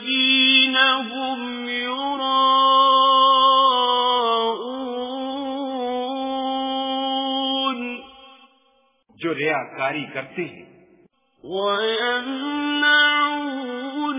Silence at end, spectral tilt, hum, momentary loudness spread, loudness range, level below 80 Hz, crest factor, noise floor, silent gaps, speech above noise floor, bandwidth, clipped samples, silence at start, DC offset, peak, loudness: 0 s; -6.5 dB/octave; none; 14 LU; 10 LU; -68 dBFS; 16 dB; -62 dBFS; none; 40 dB; 3.9 kHz; under 0.1%; 0 s; under 0.1%; -4 dBFS; -19 LUFS